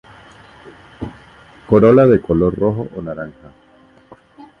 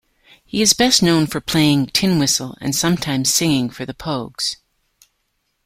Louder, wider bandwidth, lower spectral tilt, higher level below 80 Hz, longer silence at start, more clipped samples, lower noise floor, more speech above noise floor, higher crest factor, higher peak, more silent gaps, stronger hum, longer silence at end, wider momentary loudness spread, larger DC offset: first, -14 LUFS vs -17 LUFS; second, 6.6 kHz vs 16.5 kHz; first, -10 dB/octave vs -3.5 dB/octave; first, -42 dBFS vs -48 dBFS; first, 1 s vs 0.55 s; neither; second, -48 dBFS vs -69 dBFS; second, 34 dB vs 52 dB; about the same, 18 dB vs 18 dB; about the same, 0 dBFS vs 0 dBFS; neither; neither; second, 0.15 s vs 1.1 s; first, 22 LU vs 12 LU; neither